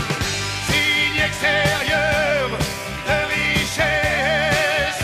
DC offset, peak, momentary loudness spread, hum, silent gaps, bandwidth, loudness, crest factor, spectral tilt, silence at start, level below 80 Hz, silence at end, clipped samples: under 0.1%; -6 dBFS; 5 LU; none; none; 15.5 kHz; -18 LUFS; 14 dB; -3 dB/octave; 0 s; -36 dBFS; 0 s; under 0.1%